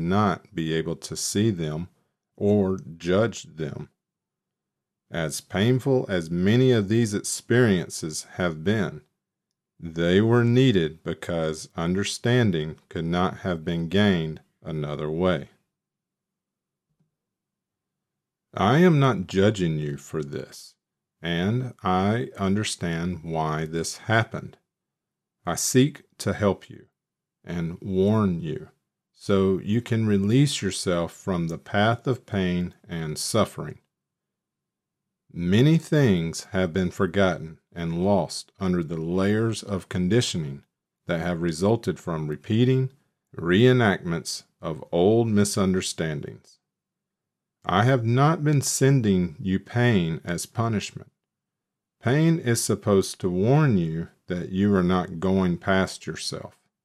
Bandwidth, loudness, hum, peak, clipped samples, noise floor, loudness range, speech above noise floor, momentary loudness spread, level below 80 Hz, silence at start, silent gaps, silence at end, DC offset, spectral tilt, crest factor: 14.5 kHz; -24 LUFS; none; -4 dBFS; under 0.1%; -87 dBFS; 5 LU; 63 dB; 13 LU; -56 dBFS; 0 s; none; 0.35 s; under 0.1%; -5.5 dB/octave; 20 dB